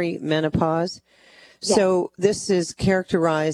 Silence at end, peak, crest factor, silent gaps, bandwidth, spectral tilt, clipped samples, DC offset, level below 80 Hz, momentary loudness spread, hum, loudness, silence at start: 0 s; -4 dBFS; 18 dB; none; 13 kHz; -5 dB/octave; under 0.1%; under 0.1%; -48 dBFS; 7 LU; none; -22 LUFS; 0 s